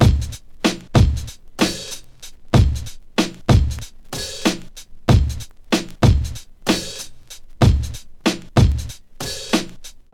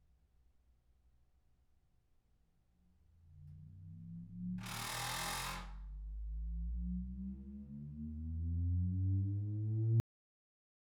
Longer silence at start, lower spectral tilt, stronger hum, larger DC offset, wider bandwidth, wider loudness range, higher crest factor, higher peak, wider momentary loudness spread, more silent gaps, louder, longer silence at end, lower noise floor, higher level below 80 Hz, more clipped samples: second, 0 s vs 3.25 s; about the same, -5.5 dB/octave vs -5 dB/octave; neither; neither; second, 16.5 kHz vs over 20 kHz; second, 1 LU vs 14 LU; about the same, 20 dB vs 18 dB; first, 0 dBFS vs -24 dBFS; about the same, 17 LU vs 17 LU; neither; first, -20 LUFS vs -41 LUFS; second, 0.15 s vs 1 s; second, -37 dBFS vs -74 dBFS; first, -26 dBFS vs -50 dBFS; neither